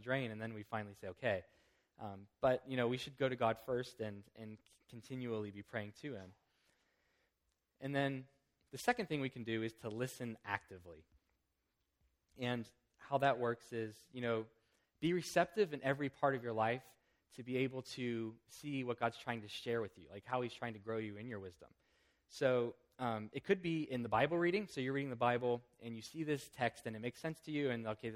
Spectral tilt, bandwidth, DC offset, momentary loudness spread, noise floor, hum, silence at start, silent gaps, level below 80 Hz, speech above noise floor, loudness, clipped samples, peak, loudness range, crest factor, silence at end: -6 dB/octave; 16 kHz; under 0.1%; 15 LU; -85 dBFS; none; 0 s; none; -76 dBFS; 45 dB; -40 LUFS; under 0.1%; -18 dBFS; 8 LU; 22 dB; 0 s